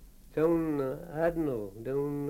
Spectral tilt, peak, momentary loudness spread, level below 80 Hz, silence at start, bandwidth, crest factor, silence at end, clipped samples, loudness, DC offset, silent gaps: -8.5 dB/octave; -16 dBFS; 8 LU; -52 dBFS; 0 s; 16.5 kHz; 16 dB; 0 s; under 0.1%; -32 LUFS; under 0.1%; none